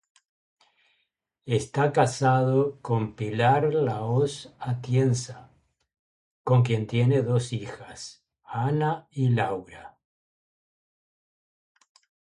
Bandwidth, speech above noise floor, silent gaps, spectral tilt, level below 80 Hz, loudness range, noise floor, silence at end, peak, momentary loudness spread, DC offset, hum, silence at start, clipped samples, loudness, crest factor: 11 kHz; 52 dB; 5.99-6.45 s; -6.5 dB/octave; -62 dBFS; 6 LU; -76 dBFS; 2.5 s; -8 dBFS; 17 LU; under 0.1%; none; 1.45 s; under 0.1%; -25 LUFS; 20 dB